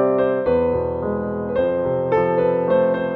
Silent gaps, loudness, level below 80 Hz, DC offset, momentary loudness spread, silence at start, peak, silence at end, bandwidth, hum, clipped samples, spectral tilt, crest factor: none; -20 LUFS; -44 dBFS; under 0.1%; 5 LU; 0 s; -6 dBFS; 0 s; 4.3 kHz; none; under 0.1%; -10 dB/octave; 12 dB